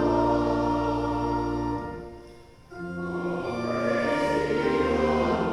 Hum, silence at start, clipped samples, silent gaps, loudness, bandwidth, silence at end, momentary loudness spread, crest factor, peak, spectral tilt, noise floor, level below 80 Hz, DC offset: none; 0 s; under 0.1%; none; -26 LUFS; 11.5 kHz; 0 s; 14 LU; 14 dB; -12 dBFS; -7 dB/octave; -48 dBFS; -42 dBFS; under 0.1%